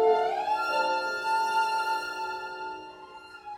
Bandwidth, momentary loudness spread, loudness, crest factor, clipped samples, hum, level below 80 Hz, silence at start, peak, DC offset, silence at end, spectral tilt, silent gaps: 16.5 kHz; 18 LU; -28 LUFS; 16 dB; under 0.1%; none; -70 dBFS; 0 s; -12 dBFS; under 0.1%; 0 s; -2 dB/octave; none